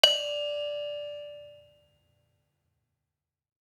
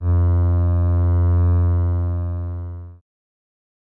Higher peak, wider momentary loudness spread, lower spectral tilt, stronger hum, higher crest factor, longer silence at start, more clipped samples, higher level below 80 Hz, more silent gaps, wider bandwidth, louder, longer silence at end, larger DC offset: first, -2 dBFS vs -10 dBFS; first, 21 LU vs 12 LU; second, 1.5 dB/octave vs -13 dB/octave; neither; first, 32 dB vs 8 dB; about the same, 0.05 s vs 0 s; neither; second, -80 dBFS vs -34 dBFS; neither; first, 18.5 kHz vs 1.9 kHz; second, -30 LUFS vs -19 LUFS; first, 2.15 s vs 1 s; neither